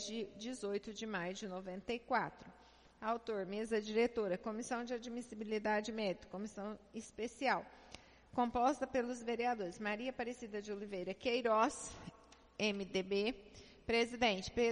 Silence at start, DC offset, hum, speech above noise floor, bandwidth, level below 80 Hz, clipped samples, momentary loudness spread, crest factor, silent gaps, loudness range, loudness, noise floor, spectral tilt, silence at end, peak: 0 s; under 0.1%; none; 20 dB; 10.5 kHz; -66 dBFS; under 0.1%; 14 LU; 20 dB; none; 3 LU; -39 LUFS; -59 dBFS; -4 dB/octave; 0 s; -20 dBFS